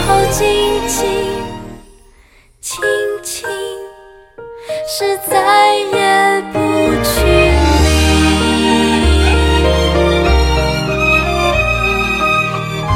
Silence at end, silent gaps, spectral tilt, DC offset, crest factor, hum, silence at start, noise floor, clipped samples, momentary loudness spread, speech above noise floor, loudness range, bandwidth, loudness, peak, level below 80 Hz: 0 s; none; -4.5 dB/octave; under 0.1%; 14 dB; none; 0 s; -46 dBFS; under 0.1%; 12 LU; 34 dB; 9 LU; 16.5 kHz; -13 LUFS; 0 dBFS; -20 dBFS